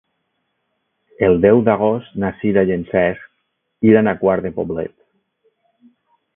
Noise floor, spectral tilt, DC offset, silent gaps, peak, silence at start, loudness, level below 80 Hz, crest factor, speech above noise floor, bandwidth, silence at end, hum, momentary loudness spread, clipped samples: -71 dBFS; -12.5 dB/octave; under 0.1%; none; 0 dBFS; 1.2 s; -16 LUFS; -46 dBFS; 18 dB; 55 dB; 3.7 kHz; 1.5 s; none; 11 LU; under 0.1%